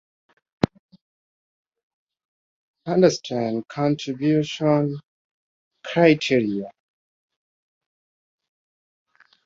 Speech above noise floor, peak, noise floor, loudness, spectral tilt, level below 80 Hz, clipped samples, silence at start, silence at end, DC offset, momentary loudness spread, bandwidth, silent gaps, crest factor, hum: over 70 dB; -2 dBFS; under -90 dBFS; -22 LUFS; -6 dB/octave; -60 dBFS; under 0.1%; 2.85 s; 2.75 s; under 0.1%; 14 LU; 7.8 kHz; 5.05-5.71 s; 24 dB; none